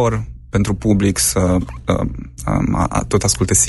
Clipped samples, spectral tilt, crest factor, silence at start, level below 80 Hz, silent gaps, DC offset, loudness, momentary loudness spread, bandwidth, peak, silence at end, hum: under 0.1%; -4.5 dB/octave; 14 dB; 0 s; -30 dBFS; none; under 0.1%; -18 LUFS; 8 LU; 12 kHz; -2 dBFS; 0 s; none